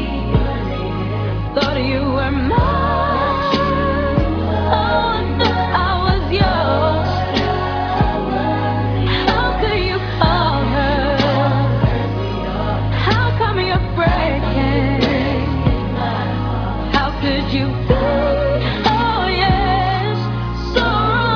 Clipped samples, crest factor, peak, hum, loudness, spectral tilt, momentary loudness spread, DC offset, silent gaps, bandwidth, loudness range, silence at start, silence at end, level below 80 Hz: under 0.1%; 16 dB; 0 dBFS; none; -17 LUFS; -7.5 dB/octave; 5 LU; under 0.1%; none; 5.4 kHz; 1 LU; 0 s; 0 s; -26 dBFS